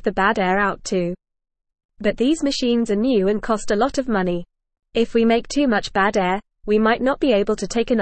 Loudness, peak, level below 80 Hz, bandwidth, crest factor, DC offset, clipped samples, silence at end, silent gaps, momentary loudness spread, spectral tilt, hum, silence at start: -20 LUFS; -4 dBFS; -42 dBFS; 8.8 kHz; 14 dB; 0.4%; under 0.1%; 0 s; 1.85-1.89 s; 7 LU; -5 dB/octave; none; 0 s